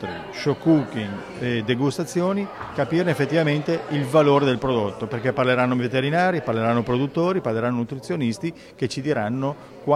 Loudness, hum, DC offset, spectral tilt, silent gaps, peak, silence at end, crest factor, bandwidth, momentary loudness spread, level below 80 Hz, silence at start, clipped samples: -23 LUFS; none; under 0.1%; -6.5 dB/octave; none; -4 dBFS; 0 s; 18 dB; 14 kHz; 9 LU; -54 dBFS; 0 s; under 0.1%